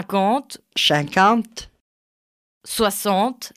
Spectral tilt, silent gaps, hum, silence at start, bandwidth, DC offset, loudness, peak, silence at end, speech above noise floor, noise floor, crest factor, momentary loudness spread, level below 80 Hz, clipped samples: -3.5 dB/octave; 1.81-2.61 s; none; 0 s; 16 kHz; under 0.1%; -19 LUFS; -4 dBFS; 0.1 s; over 70 dB; under -90 dBFS; 18 dB; 12 LU; -54 dBFS; under 0.1%